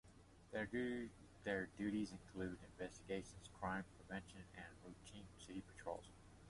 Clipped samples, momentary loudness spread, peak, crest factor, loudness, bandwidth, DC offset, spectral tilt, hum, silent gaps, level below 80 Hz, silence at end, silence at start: under 0.1%; 14 LU; -28 dBFS; 22 dB; -50 LUFS; 11.5 kHz; under 0.1%; -5.5 dB/octave; none; none; -68 dBFS; 0 s; 0.05 s